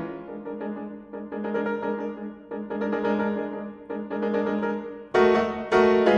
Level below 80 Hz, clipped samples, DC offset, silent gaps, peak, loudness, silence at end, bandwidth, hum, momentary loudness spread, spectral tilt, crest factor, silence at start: -58 dBFS; under 0.1%; under 0.1%; none; -6 dBFS; -26 LUFS; 0 s; 8.2 kHz; none; 16 LU; -7 dB/octave; 18 dB; 0 s